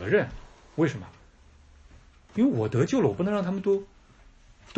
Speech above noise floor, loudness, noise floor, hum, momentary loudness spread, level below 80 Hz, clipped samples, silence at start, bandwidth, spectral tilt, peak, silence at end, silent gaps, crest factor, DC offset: 29 dB; -26 LUFS; -55 dBFS; none; 15 LU; -54 dBFS; under 0.1%; 0 s; 8.2 kHz; -7.5 dB/octave; -10 dBFS; 0.9 s; none; 18 dB; under 0.1%